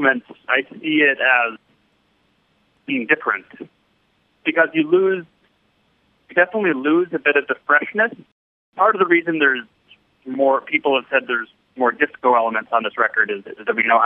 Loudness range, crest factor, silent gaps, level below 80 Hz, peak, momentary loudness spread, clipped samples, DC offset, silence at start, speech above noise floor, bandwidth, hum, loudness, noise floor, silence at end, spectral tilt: 4 LU; 18 dB; 8.32-8.73 s; -74 dBFS; -2 dBFS; 9 LU; under 0.1%; under 0.1%; 0 s; 45 dB; 3.9 kHz; none; -18 LUFS; -63 dBFS; 0 s; -8 dB/octave